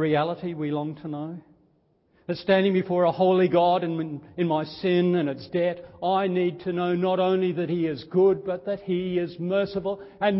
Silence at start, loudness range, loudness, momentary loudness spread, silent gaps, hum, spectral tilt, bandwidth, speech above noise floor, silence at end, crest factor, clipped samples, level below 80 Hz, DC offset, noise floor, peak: 0 s; 3 LU; -25 LUFS; 11 LU; none; none; -11.5 dB/octave; 5.8 kHz; 41 dB; 0 s; 16 dB; under 0.1%; -62 dBFS; under 0.1%; -65 dBFS; -8 dBFS